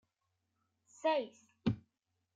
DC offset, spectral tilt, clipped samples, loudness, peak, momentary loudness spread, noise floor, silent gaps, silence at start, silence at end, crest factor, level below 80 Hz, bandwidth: under 0.1%; -6.5 dB/octave; under 0.1%; -38 LUFS; -20 dBFS; 11 LU; -85 dBFS; none; 1.05 s; 0.55 s; 20 dB; -68 dBFS; 9 kHz